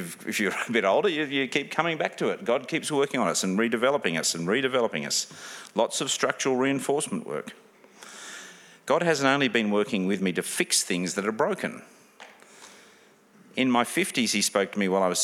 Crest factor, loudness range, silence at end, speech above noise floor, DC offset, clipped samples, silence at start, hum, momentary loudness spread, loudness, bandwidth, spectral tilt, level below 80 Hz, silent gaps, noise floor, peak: 22 dB; 3 LU; 0 s; 31 dB; under 0.1%; under 0.1%; 0 s; none; 13 LU; -26 LUFS; 16.5 kHz; -3 dB/octave; -78 dBFS; none; -57 dBFS; -6 dBFS